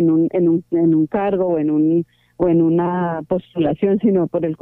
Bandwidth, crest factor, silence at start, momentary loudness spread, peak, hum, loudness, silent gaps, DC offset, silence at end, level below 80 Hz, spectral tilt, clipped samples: 3.6 kHz; 12 dB; 0 s; 6 LU; -6 dBFS; none; -18 LUFS; none; under 0.1%; 0.05 s; -52 dBFS; -11.5 dB/octave; under 0.1%